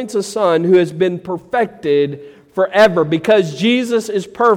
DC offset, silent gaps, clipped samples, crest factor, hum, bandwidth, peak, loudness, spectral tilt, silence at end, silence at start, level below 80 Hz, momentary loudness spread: under 0.1%; none; under 0.1%; 14 dB; none; 15.5 kHz; -2 dBFS; -15 LUFS; -5.5 dB/octave; 0 s; 0 s; -58 dBFS; 10 LU